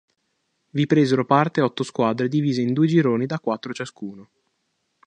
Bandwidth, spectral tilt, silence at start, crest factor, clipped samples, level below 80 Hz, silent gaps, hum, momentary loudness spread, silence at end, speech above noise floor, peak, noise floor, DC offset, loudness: 9.8 kHz; -7 dB/octave; 0.75 s; 20 dB; under 0.1%; -68 dBFS; none; none; 13 LU; 0.85 s; 52 dB; -2 dBFS; -73 dBFS; under 0.1%; -21 LUFS